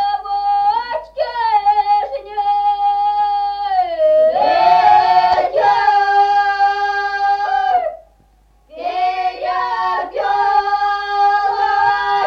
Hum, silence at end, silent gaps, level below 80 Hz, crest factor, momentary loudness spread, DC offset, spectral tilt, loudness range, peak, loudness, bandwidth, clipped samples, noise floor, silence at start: none; 0 s; none; -50 dBFS; 14 dB; 7 LU; under 0.1%; -3 dB/octave; 6 LU; 0 dBFS; -15 LUFS; 6.8 kHz; under 0.1%; -52 dBFS; 0 s